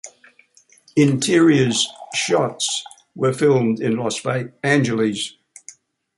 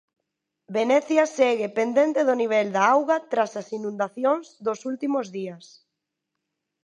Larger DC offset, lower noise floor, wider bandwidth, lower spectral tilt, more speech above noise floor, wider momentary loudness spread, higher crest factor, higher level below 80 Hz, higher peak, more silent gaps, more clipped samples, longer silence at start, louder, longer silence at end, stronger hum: neither; second, -54 dBFS vs -82 dBFS; about the same, 11.5 kHz vs 10.5 kHz; about the same, -4.5 dB/octave vs -4.5 dB/octave; second, 36 dB vs 59 dB; about the same, 10 LU vs 10 LU; about the same, 18 dB vs 20 dB; first, -62 dBFS vs -80 dBFS; first, -2 dBFS vs -6 dBFS; neither; neither; second, 0.05 s vs 0.7 s; first, -19 LUFS vs -23 LUFS; second, 0.85 s vs 1.2 s; neither